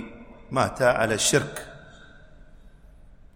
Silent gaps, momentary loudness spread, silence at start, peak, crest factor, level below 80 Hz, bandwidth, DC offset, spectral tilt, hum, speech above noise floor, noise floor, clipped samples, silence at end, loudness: none; 19 LU; 0 s; -6 dBFS; 20 dB; -50 dBFS; 16 kHz; under 0.1%; -3 dB/octave; none; 26 dB; -49 dBFS; under 0.1%; 0.65 s; -23 LUFS